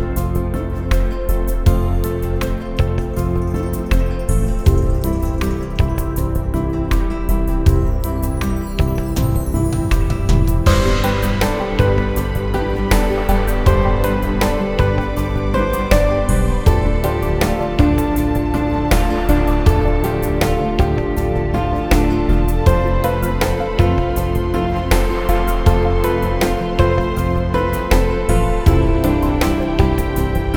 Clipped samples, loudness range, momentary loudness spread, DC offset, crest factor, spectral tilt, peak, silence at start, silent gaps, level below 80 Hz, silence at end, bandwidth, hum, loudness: under 0.1%; 3 LU; 5 LU; 0.7%; 16 dB; -6.5 dB/octave; 0 dBFS; 0 s; none; -18 dBFS; 0 s; 20 kHz; none; -18 LUFS